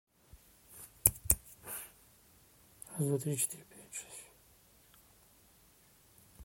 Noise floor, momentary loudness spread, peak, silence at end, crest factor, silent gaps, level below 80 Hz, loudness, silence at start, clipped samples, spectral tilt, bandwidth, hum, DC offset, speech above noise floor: -65 dBFS; 22 LU; -6 dBFS; 0 s; 34 dB; none; -56 dBFS; -34 LUFS; 0.35 s; under 0.1%; -4 dB/octave; 17 kHz; none; under 0.1%; 28 dB